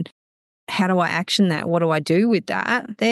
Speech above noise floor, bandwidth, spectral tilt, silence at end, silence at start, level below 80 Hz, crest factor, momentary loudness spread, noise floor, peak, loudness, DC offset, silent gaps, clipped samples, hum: over 70 dB; 12.5 kHz; -5.5 dB/octave; 0 s; 0 s; -70 dBFS; 14 dB; 4 LU; under -90 dBFS; -6 dBFS; -20 LUFS; under 0.1%; 0.12-0.67 s; under 0.1%; none